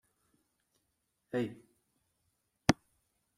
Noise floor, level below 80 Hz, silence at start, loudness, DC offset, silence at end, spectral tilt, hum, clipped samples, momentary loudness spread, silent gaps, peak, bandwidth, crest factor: -82 dBFS; -62 dBFS; 1.35 s; -35 LUFS; under 0.1%; 0.65 s; -5 dB/octave; none; under 0.1%; 8 LU; none; -8 dBFS; 15.5 kHz; 32 dB